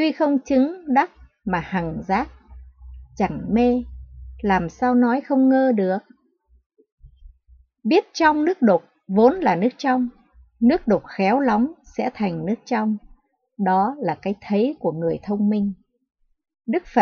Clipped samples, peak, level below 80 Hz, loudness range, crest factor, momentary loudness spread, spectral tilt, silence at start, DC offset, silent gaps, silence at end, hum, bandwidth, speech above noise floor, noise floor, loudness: under 0.1%; -4 dBFS; -48 dBFS; 4 LU; 18 dB; 10 LU; -7 dB/octave; 0 s; under 0.1%; 6.66-6.70 s, 6.92-6.98 s; 0 s; none; 6.8 kHz; 40 dB; -60 dBFS; -21 LUFS